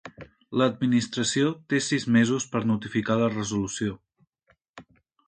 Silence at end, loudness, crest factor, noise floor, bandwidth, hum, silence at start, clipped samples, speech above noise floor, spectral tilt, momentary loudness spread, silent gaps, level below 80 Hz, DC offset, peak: 0.45 s; -25 LUFS; 20 dB; -68 dBFS; 9.4 kHz; none; 0.05 s; under 0.1%; 43 dB; -5 dB/octave; 9 LU; 4.69-4.74 s; -60 dBFS; under 0.1%; -8 dBFS